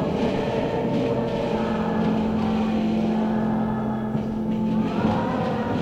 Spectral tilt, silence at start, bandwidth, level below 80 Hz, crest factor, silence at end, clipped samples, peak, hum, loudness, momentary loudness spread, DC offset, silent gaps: -8 dB/octave; 0 s; 7.8 kHz; -44 dBFS; 14 dB; 0 s; under 0.1%; -10 dBFS; none; -24 LUFS; 3 LU; under 0.1%; none